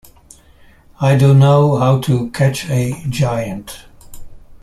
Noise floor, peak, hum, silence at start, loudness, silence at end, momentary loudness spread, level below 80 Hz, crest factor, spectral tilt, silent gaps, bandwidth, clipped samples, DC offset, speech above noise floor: -46 dBFS; -2 dBFS; none; 1 s; -14 LUFS; 0.05 s; 16 LU; -42 dBFS; 14 dB; -7 dB/octave; none; 13.5 kHz; under 0.1%; under 0.1%; 32 dB